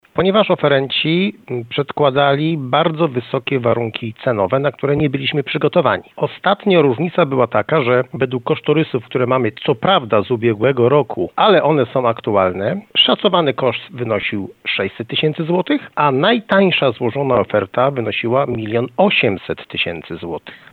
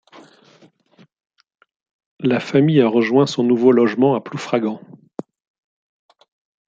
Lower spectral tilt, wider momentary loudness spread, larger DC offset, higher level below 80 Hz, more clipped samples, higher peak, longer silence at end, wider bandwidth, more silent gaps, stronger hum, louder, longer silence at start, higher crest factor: first, -8.5 dB/octave vs -7 dB/octave; second, 8 LU vs 21 LU; neither; first, -56 dBFS vs -66 dBFS; neither; about the same, 0 dBFS vs -2 dBFS; second, 0.15 s vs 1.9 s; second, 4.6 kHz vs 7.8 kHz; neither; neither; about the same, -16 LUFS vs -17 LUFS; second, 0.15 s vs 2.2 s; about the same, 16 dB vs 18 dB